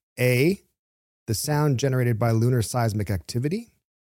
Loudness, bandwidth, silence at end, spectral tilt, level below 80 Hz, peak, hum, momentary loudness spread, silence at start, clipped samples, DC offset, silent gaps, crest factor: -24 LUFS; 16.5 kHz; 0.55 s; -6 dB/octave; -54 dBFS; -8 dBFS; none; 9 LU; 0.15 s; under 0.1%; under 0.1%; 0.79-1.26 s; 18 dB